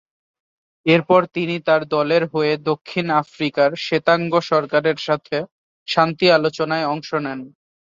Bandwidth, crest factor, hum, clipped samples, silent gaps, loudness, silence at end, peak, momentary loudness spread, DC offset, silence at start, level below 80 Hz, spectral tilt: 7.6 kHz; 18 dB; none; under 0.1%; 5.51-5.86 s; -19 LUFS; 0.45 s; -2 dBFS; 9 LU; under 0.1%; 0.85 s; -64 dBFS; -6 dB/octave